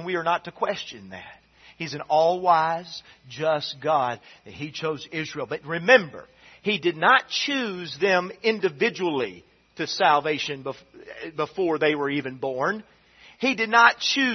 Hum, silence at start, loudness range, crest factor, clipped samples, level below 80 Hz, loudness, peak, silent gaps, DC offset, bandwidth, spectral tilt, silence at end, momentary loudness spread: none; 0 s; 4 LU; 22 dB; under 0.1%; -68 dBFS; -23 LUFS; -2 dBFS; none; under 0.1%; 6.4 kHz; -4 dB/octave; 0 s; 18 LU